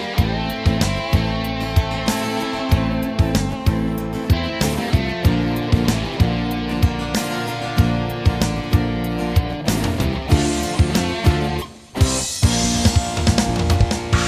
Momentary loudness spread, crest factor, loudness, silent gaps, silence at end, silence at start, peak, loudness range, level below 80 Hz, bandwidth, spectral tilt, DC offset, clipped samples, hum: 4 LU; 18 dB; -20 LUFS; none; 0 s; 0 s; -2 dBFS; 2 LU; -26 dBFS; 16 kHz; -5 dB/octave; under 0.1%; under 0.1%; none